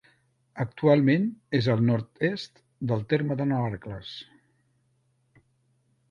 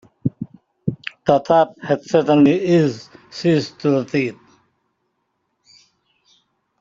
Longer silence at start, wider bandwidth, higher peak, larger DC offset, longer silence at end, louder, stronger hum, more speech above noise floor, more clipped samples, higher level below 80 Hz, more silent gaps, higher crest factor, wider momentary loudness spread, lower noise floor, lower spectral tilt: first, 0.55 s vs 0.25 s; about the same, 7.2 kHz vs 7.6 kHz; second, -8 dBFS vs 0 dBFS; neither; second, 1.85 s vs 2.5 s; second, -26 LUFS vs -18 LUFS; neither; second, 44 dB vs 55 dB; neither; about the same, -60 dBFS vs -58 dBFS; neither; about the same, 20 dB vs 20 dB; first, 17 LU vs 14 LU; about the same, -70 dBFS vs -71 dBFS; first, -8.5 dB/octave vs -7 dB/octave